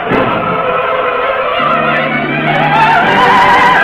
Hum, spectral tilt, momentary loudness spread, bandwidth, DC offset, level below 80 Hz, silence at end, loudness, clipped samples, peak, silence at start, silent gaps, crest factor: none; -5.5 dB/octave; 6 LU; 15 kHz; under 0.1%; -40 dBFS; 0 s; -10 LUFS; under 0.1%; 0 dBFS; 0 s; none; 10 dB